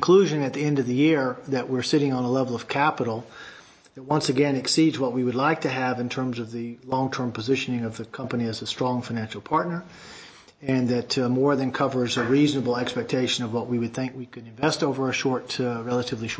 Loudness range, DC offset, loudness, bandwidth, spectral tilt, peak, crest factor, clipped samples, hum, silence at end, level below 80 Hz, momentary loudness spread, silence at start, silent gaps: 4 LU; under 0.1%; -25 LUFS; 8 kHz; -5.5 dB/octave; -6 dBFS; 18 dB; under 0.1%; none; 0 s; -62 dBFS; 12 LU; 0 s; none